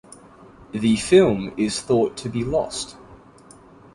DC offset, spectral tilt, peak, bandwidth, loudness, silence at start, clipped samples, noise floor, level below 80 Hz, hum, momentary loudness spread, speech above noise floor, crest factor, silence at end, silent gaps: under 0.1%; -5 dB/octave; -2 dBFS; 11.5 kHz; -21 LUFS; 0.6 s; under 0.1%; -48 dBFS; -48 dBFS; none; 14 LU; 28 dB; 20 dB; 0.8 s; none